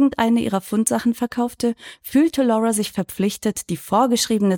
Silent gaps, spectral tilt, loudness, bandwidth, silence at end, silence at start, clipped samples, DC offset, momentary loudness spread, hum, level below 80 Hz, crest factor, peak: none; -4.5 dB/octave; -20 LUFS; 19 kHz; 0 s; 0 s; under 0.1%; under 0.1%; 7 LU; none; -54 dBFS; 16 dB; -4 dBFS